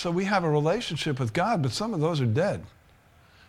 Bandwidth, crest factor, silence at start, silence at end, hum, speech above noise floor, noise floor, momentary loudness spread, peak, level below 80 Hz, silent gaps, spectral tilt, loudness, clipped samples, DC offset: 13.5 kHz; 14 dB; 0 s; 0.8 s; none; 32 dB; -57 dBFS; 5 LU; -12 dBFS; -56 dBFS; none; -6 dB/octave; -26 LUFS; under 0.1%; under 0.1%